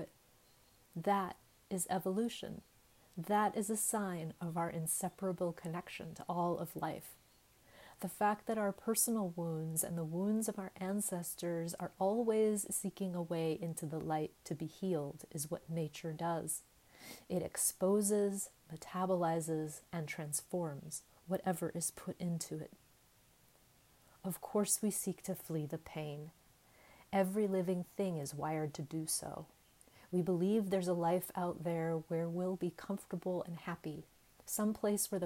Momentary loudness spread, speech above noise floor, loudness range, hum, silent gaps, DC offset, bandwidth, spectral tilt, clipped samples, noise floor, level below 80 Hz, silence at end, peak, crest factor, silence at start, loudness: 12 LU; 30 dB; 4 LU; none; none; under 0.1%; 16 kHz; -5 dB/octave; under 0.1%; -68 dBFS; -74 dBFS; 0 s; -20 dBFS; 20 dB; 0 s; -38 LUFS